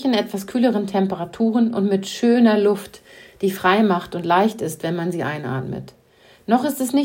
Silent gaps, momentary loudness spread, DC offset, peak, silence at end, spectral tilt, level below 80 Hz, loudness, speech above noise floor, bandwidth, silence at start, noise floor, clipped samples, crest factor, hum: none; 11 LU; under 0.1%; -4 dBFS; 0 s; -6 dB/octave; -60 dBFS; -20 LUFS; 23 dB; 16.5 kHz; 0 s; -42 dBFS; under 0.1%; 16 dB; none